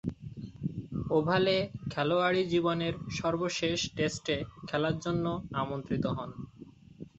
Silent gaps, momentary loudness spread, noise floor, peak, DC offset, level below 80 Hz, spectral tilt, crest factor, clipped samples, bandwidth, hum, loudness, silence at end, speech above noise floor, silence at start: none; 12 LU; -52 dBFS; -12 dBFS; under 0.1%; -56 dBFS; -5.5 dB/octave; 18 dB; under 0.1%; 8.2 kHz; none; -31 LUFS; 0.1 s; 22 dB; 0.05 s